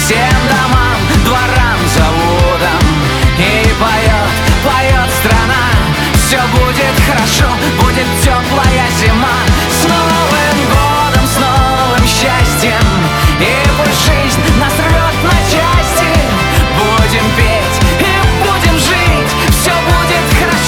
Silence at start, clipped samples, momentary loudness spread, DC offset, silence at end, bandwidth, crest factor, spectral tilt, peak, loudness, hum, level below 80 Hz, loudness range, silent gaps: 0 s; under 0.1%; 1 LU; under 0.1%; 0 s; 20 kHz; 10 dB; -4.5 dB/octave; 0 dBFS; -10 LUFS; none; -16 dBFS; 0 LU; none